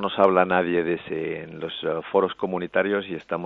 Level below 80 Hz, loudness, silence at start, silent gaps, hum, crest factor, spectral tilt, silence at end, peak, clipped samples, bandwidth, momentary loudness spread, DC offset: -64 dBFS; -24 LUFS; 0 s; none; none; 20 dB; -8 dB/octave; 0 s; -4 dBFS; under 0.1%; 5 kHz; 11 LU; under 0.1%